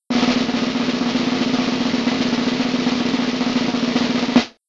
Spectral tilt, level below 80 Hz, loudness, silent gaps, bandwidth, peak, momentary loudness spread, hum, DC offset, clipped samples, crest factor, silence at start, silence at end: -4.5 dB/octave; -50 dBFS; -19 LUFS; none; 7.8 kHz; 0 dBFS; 2 LU; none; under 0.1%; under 0.1%; 18 dB; 0.1 s; 0.2 s